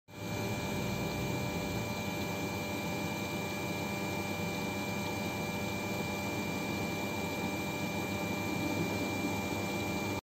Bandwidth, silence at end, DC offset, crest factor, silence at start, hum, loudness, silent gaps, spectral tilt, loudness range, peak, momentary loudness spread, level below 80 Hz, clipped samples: 16 kHz; 0.05 s; under 0.1%; 14 dB; 0.1 s; none; -35 LUFS; none; -4.5 dB/octave; 1 LU; -22 dBFS; 2 LU; -56 dBFS; under 0.1%